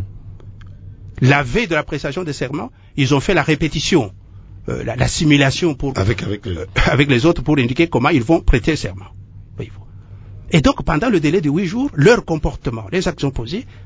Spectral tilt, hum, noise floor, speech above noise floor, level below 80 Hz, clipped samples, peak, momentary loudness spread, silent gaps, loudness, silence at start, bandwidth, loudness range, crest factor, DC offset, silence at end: -6 dB/octave; none; -37 dBFS; 20 dB; -30 dBFS; under 0.1%; 0 dBFS; 16 LU; none; -17 LUFS; 0 s; 8 kHz; 3 LU; 18 dB; under 0.1%; 0 s